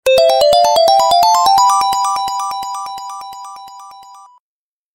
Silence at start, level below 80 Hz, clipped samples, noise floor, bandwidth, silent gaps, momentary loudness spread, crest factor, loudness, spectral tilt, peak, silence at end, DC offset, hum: 0.05 s; -52 dBFS; under 0.1%; under -90 dBFS; 16.5 kHz; none; 19 LU; 14 dB; -12 LUFS; -0.5 dB/octave; 0 dBFS; 0.8 s; under 0.1%; none